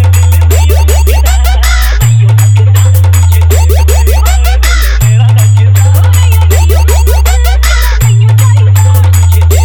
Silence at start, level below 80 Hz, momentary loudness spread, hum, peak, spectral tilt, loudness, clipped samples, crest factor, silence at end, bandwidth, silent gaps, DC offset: 0 s; -8 dBFS; 3 LU; none; 0 dBFS; -4.5 dB/octave; -6 LUFS; 0.7%; 4 dB; 0 s; over 20 kHz; none; under 0.1%